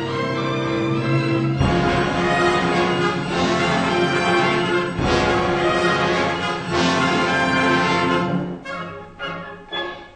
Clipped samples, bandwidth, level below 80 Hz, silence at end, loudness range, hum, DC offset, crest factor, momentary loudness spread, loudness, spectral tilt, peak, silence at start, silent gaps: under 0.1%; 9.2 kHz; -40 dBFS; 0.05 s; 2 LU; none; under 0.1%; 16 dB; 11 LU; -19 LUFS; -5.5 dB/octave; -4 dBFS; 0 s; none